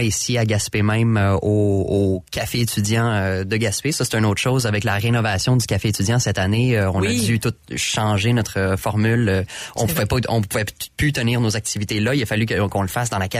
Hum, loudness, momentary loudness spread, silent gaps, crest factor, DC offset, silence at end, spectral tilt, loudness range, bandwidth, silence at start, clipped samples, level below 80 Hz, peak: none; -20 LUFS; 4 LU; none; 12 dB; under 0.1%; 0 s; -5 dB/octave; 2 LU; 15.5 kHz; 0 s; under 0.1%; -42 dBFS; -8 dBFS